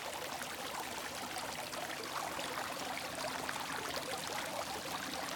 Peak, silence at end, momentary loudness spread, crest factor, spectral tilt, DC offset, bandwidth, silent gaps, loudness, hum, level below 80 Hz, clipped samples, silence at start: -20 dBFS; 0 s; 2 LU; 22 dB; -2 dB/octave; under 0.1%; 18 kHz; none; -40 LUFS; none; -70 dBFS; under 0.1%; 0 s